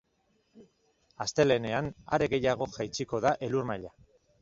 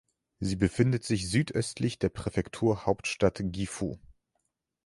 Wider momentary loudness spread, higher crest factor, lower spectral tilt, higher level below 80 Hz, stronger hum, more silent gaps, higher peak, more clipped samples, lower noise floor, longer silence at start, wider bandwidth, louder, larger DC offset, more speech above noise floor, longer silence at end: first, 11 LU vs 8 LU; about the same, 20 dB vs 20 dB; about the same, -5 dB/octave vs -6 dB/octave; second, -58 dBFS vs -50 dBFS; neither; neither; about the same, -10 dBFS vs -10 dBFS; neither; second, -73 dBFS vs -80 dBFS; first, 0.55 s vs 0.4 s; second, 7.8 kHz vs 11.5 kHz; about the same, -30 LUFS vs -30 LUFS; neither; second, 43 dB vs 51 dB; second, 0.55 s vs 0.9 s